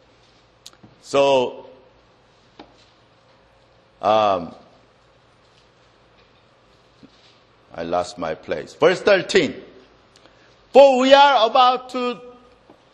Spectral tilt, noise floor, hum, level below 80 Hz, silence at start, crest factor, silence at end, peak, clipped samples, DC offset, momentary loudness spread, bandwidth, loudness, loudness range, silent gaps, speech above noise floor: -4 dB/octave; -55 dBFS; none; -62 dBFS; 1.1 s; 22 dB; 0.65 s; 0 dBFS; under 0.1%; under 0.1%; 19 LU; 10 kHz; -17 LUFS; 15 LU; none; 39 dB